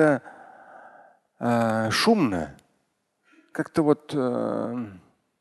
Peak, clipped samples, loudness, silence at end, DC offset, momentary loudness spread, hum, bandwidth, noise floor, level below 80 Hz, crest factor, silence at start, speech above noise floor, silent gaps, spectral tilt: -6 dBFS; under 0.1%; -25 LUFS; 0.4 s; under 0.1%; 15 LU; none; 12.5 kHz; -73 dBFS; -58 dBFS; 20 dB; 0 s; 50 dB; none; -5.5 dB/octave